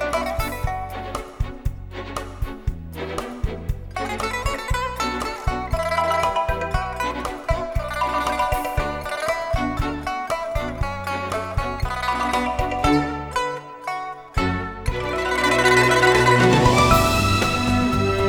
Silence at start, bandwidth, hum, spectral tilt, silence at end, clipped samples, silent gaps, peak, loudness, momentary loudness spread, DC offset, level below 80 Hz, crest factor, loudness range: 0 s; over 20 kHz; none; -5 dB/octave; 0 s; under 0.1%; none; -2 dBFS; -22 LUFS; 15 LU; under 0.1%; -32 dBFS; 20 dB; 12 LU